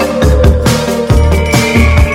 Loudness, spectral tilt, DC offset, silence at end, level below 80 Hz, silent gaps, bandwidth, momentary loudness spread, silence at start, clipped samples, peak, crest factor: -9 LUFS; -5.5 dB/octave; under 0.1%; 0 s; -12 dBFS; none; 16.5 kHz; 3 LU; 0 s; 0.8%; 0 dBFS; 8 dB